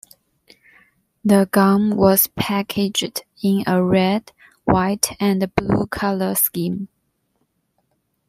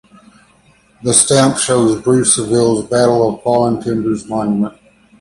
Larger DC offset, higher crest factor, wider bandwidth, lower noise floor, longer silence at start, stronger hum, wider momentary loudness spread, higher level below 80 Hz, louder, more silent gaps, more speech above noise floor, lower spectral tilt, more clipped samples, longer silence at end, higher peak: neither; first, 20 dB vs 14 dB; first, 16 kHz vs 11.5 kHz; first, -69 dBFS vs -51 dBFS; first, 1.25 s vs 1 s; neither; about the same, 10 LU vs 8 LU; about the same, -48 dBFS vs -48 dBFS; second, -19 LUFS vs -13 LUFS; neither; first, 51 dB vs 37 dB; about the same, -5 dB/octave vs -4 dB/octave; neither; first, 1.45 s vs 0.5 s; about the same, 0 dBFS vs 0 dBFS